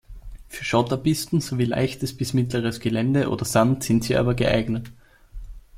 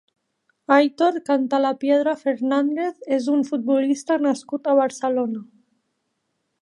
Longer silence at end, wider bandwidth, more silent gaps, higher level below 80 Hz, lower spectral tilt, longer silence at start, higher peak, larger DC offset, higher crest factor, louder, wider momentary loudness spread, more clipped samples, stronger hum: second, 0 s vs 1.2 s; first, 16 kHz vs 11 kHz; neither; first, -42 dBFS vs -80 dBFS; first, -6 dB/octave vs -4.5 dB/octave; second, 0.1 s vs 0.7 s; about the same, -4 dBFS vs -2 dBFS; neither; about the same, 20 dB vs 20 dB; about the same, -23 LUFS vs -21 LUFS; about the same, 7 LU vs 6 LU; neither; neither